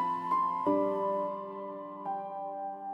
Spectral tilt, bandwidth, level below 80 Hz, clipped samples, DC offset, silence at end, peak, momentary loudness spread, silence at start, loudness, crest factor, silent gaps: -8 dB/octave; 8.2 kHz; -80 dBFS; under 0.1%; under 0.1%; 0 s; -18 dBFS; 11 LU; 0 s; -33 LUFS; 16 dB; none